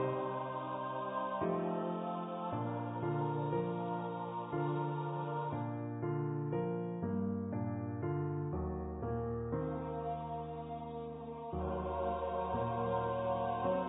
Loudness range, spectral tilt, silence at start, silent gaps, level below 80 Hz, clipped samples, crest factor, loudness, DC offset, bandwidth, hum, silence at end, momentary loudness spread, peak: 2 LU; -6 dB/octave; 0 s; none; -54 dBFS; under 0.1%; 14 dB; -38 LUFS; under 0.1%; 3.9 kHz; none; 0 s; 5 LU; -24 dBFS